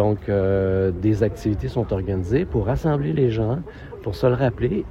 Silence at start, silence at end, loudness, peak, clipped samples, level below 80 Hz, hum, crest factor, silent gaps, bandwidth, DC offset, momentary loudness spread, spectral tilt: 0 s; 0 s; -22 LUFS; -4 dBFS; under 0.1%; -36 dBFS; none; 16 dB; none; 12.5 kHz; under 0.1%; 5 LU; -9 dB/octave